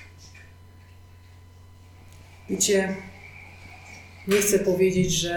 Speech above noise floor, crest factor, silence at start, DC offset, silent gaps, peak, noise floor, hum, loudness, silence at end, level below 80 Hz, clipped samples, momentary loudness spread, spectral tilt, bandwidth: 26 dB; 18 dB; 0 s; under 0.1%; none; -8 dBFS; -49 dBFS; none; -23 LUFS; 0 s; -50 dBFS; under 0.1%; 23 LU; -3.5 dB/octave; 19 kHz